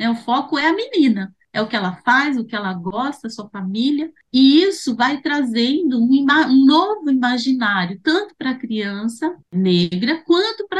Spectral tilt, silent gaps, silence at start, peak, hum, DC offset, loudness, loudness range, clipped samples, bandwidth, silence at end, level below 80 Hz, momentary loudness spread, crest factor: -5.5 dB/octave; none; 0 s; -2 dBFS; none; under 0.1%; -18 LUFS; 5 LU; under 0.1%; 11 kHz; 0 s; -64 dBFS; 12 LU; 14 dB